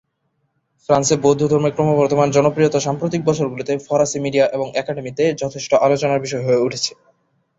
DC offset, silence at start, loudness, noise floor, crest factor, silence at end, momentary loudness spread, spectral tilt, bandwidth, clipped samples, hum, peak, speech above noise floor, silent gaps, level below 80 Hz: under 0.1%; 0.9 s; -18 LUFS; -69 dBFS; 16 dB; 0.7 s; 8 LU; -5 dB/octave; 8 kHz; under 0.1%; none; -2 dBFS; 52 dB; none; -56 dBFS